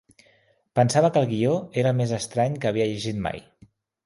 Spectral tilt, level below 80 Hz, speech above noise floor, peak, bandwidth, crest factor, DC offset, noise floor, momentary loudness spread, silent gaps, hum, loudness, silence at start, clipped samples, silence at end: -6 dB/octave; -56 dBFS; 39 dB; -6 dBFS; 11.5 kHz; 18 dB; under 0.1%; -62 dBFS; 9 LU; none; none; -24 LUFS; 0.75 s; under 0.1%; 0.65 s